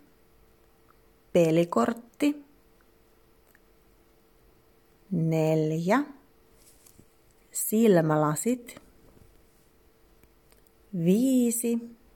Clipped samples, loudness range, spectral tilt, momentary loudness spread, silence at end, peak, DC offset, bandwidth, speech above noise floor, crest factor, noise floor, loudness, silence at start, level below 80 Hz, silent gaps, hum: under 0.1%; 6 LU; -6 dB/octave; 12 LU; 0.25 s; -10 dBFS; under 0.1%; 17.5 kHz; 37 dB; 18 dB; -62 dBFS; -26 LUFS; 1.35 s; -66 dBFS; none; none